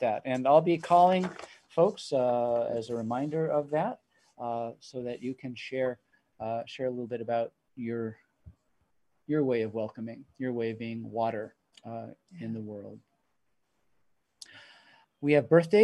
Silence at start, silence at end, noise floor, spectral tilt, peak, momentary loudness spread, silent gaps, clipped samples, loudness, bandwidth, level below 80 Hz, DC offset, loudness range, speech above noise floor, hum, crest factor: 0 s; 0 s; -79 dBFS; -7 dB/octave; -8 dBFS; 19 LU; none; under 0.1%; -30 LUFS; 11.5 kHz; -72 dBFS; under 0.1%; 12 LU; 50 dB; none; 22 dB